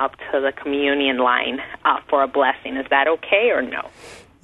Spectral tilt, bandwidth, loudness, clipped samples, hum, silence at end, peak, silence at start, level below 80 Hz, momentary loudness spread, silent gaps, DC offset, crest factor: -4 dB/octave; 11.5 kHz; -19 LUFS; under 0.1%; none; 0.25 s; -2 dBFS; 0 s; -56 dBFS; 9 LU; none; under 0.1%; 18 dB